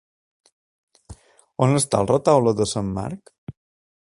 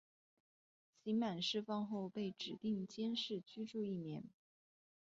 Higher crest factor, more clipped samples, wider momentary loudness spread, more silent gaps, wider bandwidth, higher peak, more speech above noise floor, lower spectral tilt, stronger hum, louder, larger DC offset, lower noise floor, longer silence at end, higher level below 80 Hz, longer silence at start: first, 22 dB vs 16 dB; neither; first, 24 LU vs 9 LU; first, 3.38-3.47 s vs none; first, 11.5 kHz vs 7.6 kHz; first, -2 dBFS vs -28 dBFS; second, 26 dB vs over 47 dB; about the same, -5.5 dB/octave vs -4.5 dB/octave; neither; first, -20 LUFS vs -43 LUFS; neither; second, -46 dBFS vs under -90 dBFS; second, 0.5 s vs 0.75 s; first, -50 dBFS vs -84 dBFS; about the same, 1.1 s vs 1.05 s